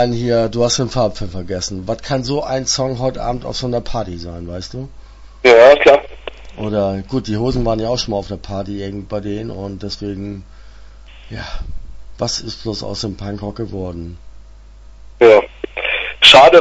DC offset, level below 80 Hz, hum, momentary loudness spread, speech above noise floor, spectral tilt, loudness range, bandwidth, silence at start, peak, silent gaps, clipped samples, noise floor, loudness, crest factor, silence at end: under 0.1%; -34 dBFS; none; 21 LU; 24 dB; -4 dB/octave; 13 LU; 11 kHz; 0 s; 0 dBFS; none; 0.1%; -39 dBFS; -15 LUFS; 16 dB; 0 s